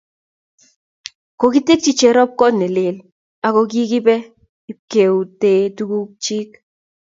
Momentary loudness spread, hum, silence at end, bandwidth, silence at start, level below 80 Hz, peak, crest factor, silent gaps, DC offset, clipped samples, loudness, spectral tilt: 22 LU; none; 0.55 s; 7.8 kHz; 1.4 s; -62 dBFS; 0 dBFS; 16 dB; 3.12-3.42 s, 4.49-4.68 s, 4.79-4.88 s; under 0.1%; under 0.1%; -16 LUFS; -4.5 dB/octave